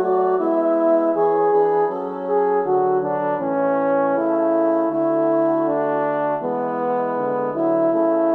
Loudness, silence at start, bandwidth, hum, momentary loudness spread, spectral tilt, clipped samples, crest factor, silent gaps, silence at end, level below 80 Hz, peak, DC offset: -19 LUFS; 0 s; 4.2 kHz; none; 5 LU; -10 dB/octave; under 0.1%; 12 dB; none; 0 s; -70 dBFS; -8 dBFS; under 0.1%